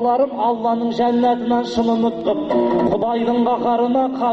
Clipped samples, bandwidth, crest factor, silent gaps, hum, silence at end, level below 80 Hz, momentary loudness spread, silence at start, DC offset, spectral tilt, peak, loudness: under 0.1%; 7.6 kHz; 10 dB; none; none; 0 s; -52 dBFS; 2 LU; 0 s; under 0.1%; -7 dB/octave; -6 dBFS; -18 LUFS